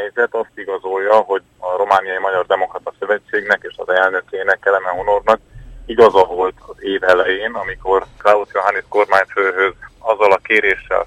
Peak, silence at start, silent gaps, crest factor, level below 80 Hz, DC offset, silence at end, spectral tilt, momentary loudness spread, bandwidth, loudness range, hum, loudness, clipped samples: 0 dBFS; 0 s; none; 16 dB; -46 dBFS; under 0.1%; 0 s; -4.5 dB/octave; 9 LU; 11 kHz; 2 LU; none; -16 LUFS; under 0.1%